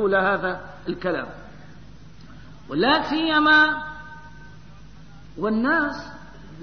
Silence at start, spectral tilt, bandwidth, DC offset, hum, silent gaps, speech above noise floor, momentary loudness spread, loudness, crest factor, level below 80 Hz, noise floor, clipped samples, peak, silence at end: 0 s; -5.5 dB/octave; 6.6 kHz; 0.6%; none; none; 24 dB; 25 LU; -21 LUFS; 18 dB; -50 dBFS; -45 dBFS; under 0.1%; -6 dBFS; 0 s